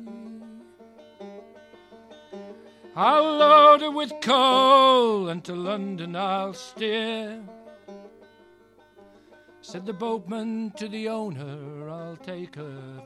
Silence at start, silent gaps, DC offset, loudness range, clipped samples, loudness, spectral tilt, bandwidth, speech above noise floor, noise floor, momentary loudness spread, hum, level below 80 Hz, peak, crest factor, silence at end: 0 s; none; under 0.1%; 17 LU; under 0.1%; -21 LUFS; -5 dB/octave; 12.5 kHz; 34 dB; -56 dBFS; 26 LU; none; -74 dBFS; -4 dBFS; 20 dB; 0 s